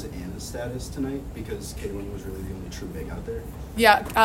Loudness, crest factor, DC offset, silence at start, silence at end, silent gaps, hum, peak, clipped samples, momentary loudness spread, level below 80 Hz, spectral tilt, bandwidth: -28 LUFS; 26 dB; under 0.1%; 0 s; 0 s; none; none; -2 dBFS; under 0.1%; 17 LU; -40 dBFS; -4.5 dB/octave; 16 kHz